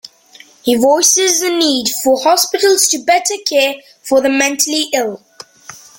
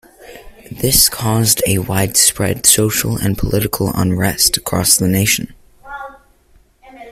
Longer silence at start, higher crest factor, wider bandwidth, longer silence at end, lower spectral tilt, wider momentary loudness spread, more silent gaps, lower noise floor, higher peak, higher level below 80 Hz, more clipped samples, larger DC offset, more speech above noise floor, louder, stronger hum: first, 0.65 s vs 0.2 s; about the same, 14 dB vs 16 dB; second, 17 kHz vs over 20 kHz; first, 0.2 s vs 0 s; second, -0.5 dB/octave vs -3 dB/octave; second, 9 LU vs 16 LU; neither; second, -43 dBFS vs -51 dBFS; about the same, 0 dBFS vs 0 dBFS; second, -60 dBFS vs -36 dBFS; neither; neither; second, 30 dB vs 37 dB; about the same, -12 LUFS vs -13 LUFS; neither